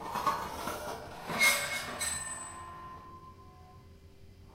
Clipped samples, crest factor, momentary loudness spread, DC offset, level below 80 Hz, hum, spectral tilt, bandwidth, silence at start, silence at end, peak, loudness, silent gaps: under 0.1%; 22 dB; 23 LU; under 0.1%; -58 dBFS; none; -1 dB/octave; 16 kHz; 0 s; 0 s; -14 dBFS; -32 LUFS; none